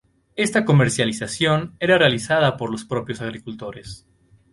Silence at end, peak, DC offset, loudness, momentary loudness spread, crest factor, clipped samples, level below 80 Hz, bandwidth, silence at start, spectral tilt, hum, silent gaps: 0.55 s; -4 dBFS; under 0.1%; -20 LUFS; 17 LU; 18 dB; under 0.1%; -52 dBFS; 11.5 kHz; 0.35 s; -5 dB/octave; none; none